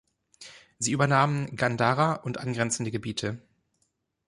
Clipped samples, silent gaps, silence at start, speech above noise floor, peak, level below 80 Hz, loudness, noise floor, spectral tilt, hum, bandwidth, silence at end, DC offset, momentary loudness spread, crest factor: under 0.1%; none; 0.4 s; 49 dB; -8 dBFS; -62 dBFS; -27 LUFS; -75 dBFS; -4.5 dB/octave; none; 11.5 kHz; 0.9 s; under 0.1%; 19 LU; 20 dB